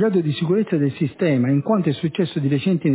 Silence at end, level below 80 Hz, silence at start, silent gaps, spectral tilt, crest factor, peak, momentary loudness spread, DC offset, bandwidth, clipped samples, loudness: 0 s; -60 dBFS; 0 s; none; -12 dB/octave; 12 dB; -6 dBFS; 4 LU; under 0.1%; 4 kHz; under 0.1%; -20 LUFS